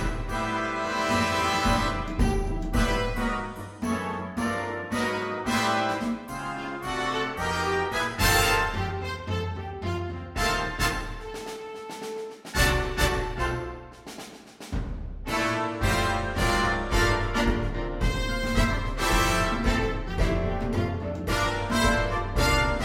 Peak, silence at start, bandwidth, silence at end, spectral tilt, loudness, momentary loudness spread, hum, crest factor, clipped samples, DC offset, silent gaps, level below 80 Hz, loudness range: -8 dBFS; 0 s; 16.5 kHz; 0 s; -4.5 dB/octave; -27 LUFS; 12 LU; none; 18 dB; under 0.1%; under 0.1%; none; -34 dBFS; 4 LU